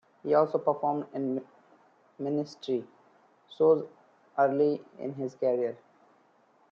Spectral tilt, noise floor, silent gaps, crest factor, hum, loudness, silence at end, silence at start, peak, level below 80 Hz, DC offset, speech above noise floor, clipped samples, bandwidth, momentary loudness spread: -8 dB/octave; -65 dBFS; none; 18 dB; none; -29 LUFS; 0.95 s; 0.25 s; -12 dBFS; -80 dBFS; under 0.1%; 37 dB; under 0.1%; 7 kHz; 13 LU